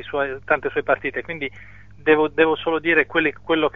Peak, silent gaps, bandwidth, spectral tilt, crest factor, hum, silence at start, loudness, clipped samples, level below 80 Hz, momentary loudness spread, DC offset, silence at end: -2 dBFS; none; 4 kHz; -7 dB/octave; 18 dB; none; 0 s; -20 LUFS; under 0.1%; -52 dBFS; 10 LU; 0.5%; 0.05 s